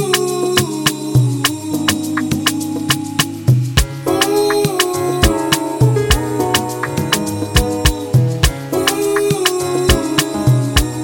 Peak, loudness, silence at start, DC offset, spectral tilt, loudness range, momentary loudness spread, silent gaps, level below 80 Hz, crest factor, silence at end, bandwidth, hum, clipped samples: 0 dBFS; -15 LUFS; 0 s; under 0.1%; -4.5 dB/octave; 1 LU; 4 LU; none; -26 dBFS; 16 dB; 0 s; 19 kHz; none; under 0.1%